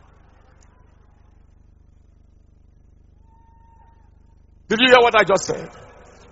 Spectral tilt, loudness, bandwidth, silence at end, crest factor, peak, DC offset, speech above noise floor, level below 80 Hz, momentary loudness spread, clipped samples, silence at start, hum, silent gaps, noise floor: -1 dB/octave; -16 LUFS; 8 kHz; 0.65 s; 24 dB; 0 dBFS; under 0.1%; 36 dB; -52 dBFS; 17 LU; under 0.1%; 4.7 s; 50 Hz at -55 dBFS; none; -51 dBFS